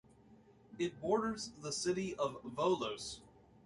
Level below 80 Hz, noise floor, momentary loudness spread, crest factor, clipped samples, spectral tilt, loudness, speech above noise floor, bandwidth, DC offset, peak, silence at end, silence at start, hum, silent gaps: -68 dBFS; -63 dBFS; 10 LU; 20 dB; under 0.1%; -4 dB/octave; -38 LUFS; 26 dB; 11.5 kHz; under 0.1%; -20 dBFS; 0.35 s; 0.3 s; none; none